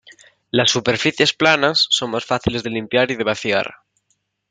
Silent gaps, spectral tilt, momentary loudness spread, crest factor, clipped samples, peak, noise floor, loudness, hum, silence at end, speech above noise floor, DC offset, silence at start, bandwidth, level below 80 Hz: none; -3.5 dB/octave; 7 LU; 18 dB; under 0.1%; 0 dBFS; -68 dBFS; -17 LUFS; 50 Hz at -50 dBFS; 0.75 s; 50 dB; under 0.1%; 0.55 s; 9.6 kHz; -48 dBFS